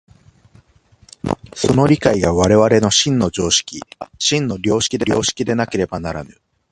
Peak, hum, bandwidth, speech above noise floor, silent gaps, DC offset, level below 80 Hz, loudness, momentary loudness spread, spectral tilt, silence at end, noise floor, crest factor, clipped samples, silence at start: 0 dBFS; none; 11.5 kHz; 35 dB; none; under 0.1%; -40 dBFS; -16 LUFS; 14 LU; -4 dB/octave; 0.45 s; -51 dBFS; 18 dB; under 0.1%; 1.25 s